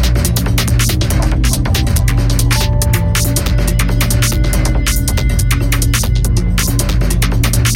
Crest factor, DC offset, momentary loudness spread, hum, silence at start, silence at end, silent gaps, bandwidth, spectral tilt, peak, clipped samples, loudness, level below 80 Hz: 12 dB; under 0.1%; 2 LU; none; 0 s; 0 s; none; 17 kHz; -4.5 dB/octave; 0 dBFS; under 0.1%; -14 LUFS; -16 dBFS